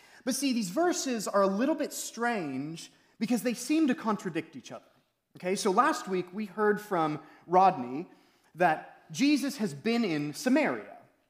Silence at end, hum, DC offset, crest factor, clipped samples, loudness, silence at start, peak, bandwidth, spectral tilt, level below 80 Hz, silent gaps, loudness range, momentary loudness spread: 0.3 s; none; under 0.1%; 20 dB; under 0.1%; -29 LUFS; 0.25 s; -10 dBFS; 16 kHz; -4.5 dB/octave; -84 dBFS; none; 3 LU; 14 LU